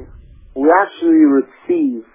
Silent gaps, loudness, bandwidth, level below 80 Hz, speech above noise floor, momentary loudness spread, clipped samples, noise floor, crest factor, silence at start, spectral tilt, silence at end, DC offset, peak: none; -14 LUFS; 3.7 kHz; -46 dBFS; 26 dB; 8 LU; under 0.1%; -40 dBFS; 14 dB; 0 s; -10 dB/octave; 0.15 s; under 0.1%; 0 dBFS